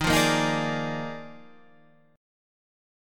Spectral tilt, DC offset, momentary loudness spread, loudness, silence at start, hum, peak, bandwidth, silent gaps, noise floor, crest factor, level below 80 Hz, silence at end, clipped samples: -4 dB/octave; under 0.1%; 20 LU; -26 LUFS; 0 s; none; -10 dBFS; 17.5 kHz; none; -59 dBFS; 20 dB; -48 dBFS; 0.95 s; under 0.1%